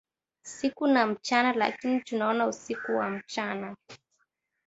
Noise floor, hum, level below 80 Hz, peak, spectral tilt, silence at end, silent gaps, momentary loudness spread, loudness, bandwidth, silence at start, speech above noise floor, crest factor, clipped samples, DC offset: -76 dBFS; none; -74 dBFS; -8 dBFS; -4 dB/octave; 0.7 s; none; 14 LU; -28 LUFS; 8 kHz; 0.45 s; 48 dB; 22 dB; under 0.1%; under 0.1%